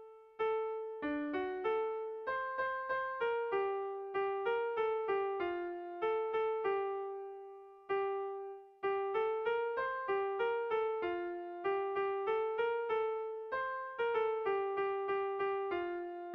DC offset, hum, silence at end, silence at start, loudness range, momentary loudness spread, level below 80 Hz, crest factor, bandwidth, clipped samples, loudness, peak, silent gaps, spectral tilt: under 0.1%; none; 0 s; 0 s; 2 LU; 6 LU; -74 dBFS; 12 dB; 5.4 kHz; under 0.1%; -37 LUFS; -24 dBFS; none; -6.5 dB/octave